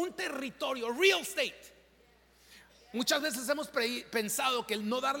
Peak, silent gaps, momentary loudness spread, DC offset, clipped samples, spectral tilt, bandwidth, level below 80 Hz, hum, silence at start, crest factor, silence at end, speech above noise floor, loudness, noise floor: -12 dBFS; none; 9 LU; under 0.1%; under 0.1%; -2 dB/octave; 17 kHz; -72 dBFS; none; 0 s; 22 dB; 0 s; 32 dB; -31 LUFS; -64 dBFS